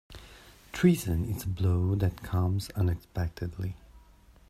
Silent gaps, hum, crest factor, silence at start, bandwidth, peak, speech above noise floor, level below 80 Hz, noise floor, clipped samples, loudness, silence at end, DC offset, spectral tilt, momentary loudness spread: none; none; 20 dB; 0.1 s; 14.5 kHz; -10 dBFS; 29 dB; -48 dBFS; -57 dBFS; under 0.1%; -30 LUFS; 0.5 s; under 0.1%; -7 dB/octave; 15 LU